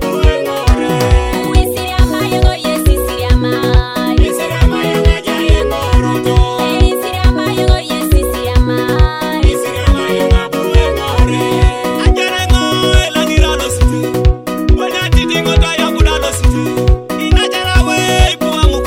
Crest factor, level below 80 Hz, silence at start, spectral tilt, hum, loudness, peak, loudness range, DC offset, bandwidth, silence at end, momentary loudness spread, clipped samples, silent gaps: 10 dB; -14 dBFS; 0 s; -5.5 dB/octave; none; -13 LUFS; 0 dBFS; 1 LU; under 0.1%; 16.5 kHz; 0 s; 2 LU; 0.4%; none